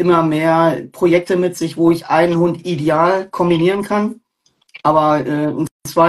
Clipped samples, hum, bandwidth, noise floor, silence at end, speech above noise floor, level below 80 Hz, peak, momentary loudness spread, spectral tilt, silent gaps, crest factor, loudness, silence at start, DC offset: under 0.1%; none; 12.5 kHz; -61 dBFS; 0 s; 46 dB; -52 dBFS; 0 dBFS; 6 LU; -6.5 dB/octave; 5.71-5.80 s; 14 dB; -16 LUFS; 0 s; under 0.1%